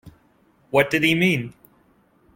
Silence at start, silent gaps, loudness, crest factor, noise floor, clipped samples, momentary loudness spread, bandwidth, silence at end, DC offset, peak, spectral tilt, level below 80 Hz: 0.05 s; none; -20 LUFS; 20 dB; -59 dBFS; under 0.1%; 8 LU; 16.5 kHz; 0.85 s; under 0.1%; -4 dBFS; -5.5 dB/octave; -56 dBFS